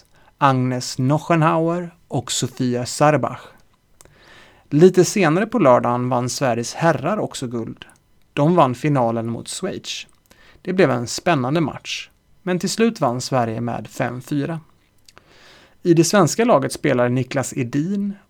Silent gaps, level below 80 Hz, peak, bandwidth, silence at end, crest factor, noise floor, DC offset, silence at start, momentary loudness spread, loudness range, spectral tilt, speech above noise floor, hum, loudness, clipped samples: none; -58 dBFS; 0 dBFS; 19 kHz; 0.15 s; 20 dB; -51 dBFS; under 0.1%; 0.4 s; 13 LU; 5 LU; -5.5 dB/octave; 33 dB; none; -19 LUFS; under 0.1%